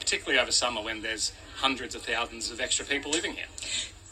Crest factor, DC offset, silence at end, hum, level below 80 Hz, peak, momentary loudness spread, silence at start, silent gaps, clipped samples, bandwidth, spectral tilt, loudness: 22 dB; under 0.1%; 0 s; none; -54 dBFS; -8 dBFS; 8 LU; 0 s; none; under 0.1%; 14.5 kHz; -0.5 dB/octave; -28 LUFS